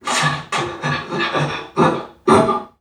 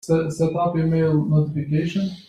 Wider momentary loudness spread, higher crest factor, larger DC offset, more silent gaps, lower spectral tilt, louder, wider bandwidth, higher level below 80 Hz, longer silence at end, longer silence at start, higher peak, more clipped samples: first, 8 LU vs 4 LU; first, 18 dB vs 12 dB; neither; neither; second, -4.5 dB/octave vs -8 dB/octave; first, -18 LUFS vs -21 LUFS; first, 14 kHz vs 11.5 kHz; about the same, -52 dBFS vs -50 dBFS; about the same, 0.15 s vs 0.1 s; about the same, 0.05 s vs 0.05 s; first, 0 dBFS vs -8 dBFS; neither